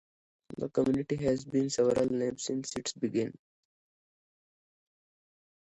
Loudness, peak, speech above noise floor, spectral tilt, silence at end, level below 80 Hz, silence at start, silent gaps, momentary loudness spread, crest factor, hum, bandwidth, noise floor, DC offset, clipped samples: -31 LUFS; -14 dBFS; over 60 dB; -5.5 dB/octave; 2.3 s; -64 dBFS; 0.5 s; none; 9 LU; 18 dB; none; 11 kHz; under -90 dBFS; under 0.1%; under 0.1%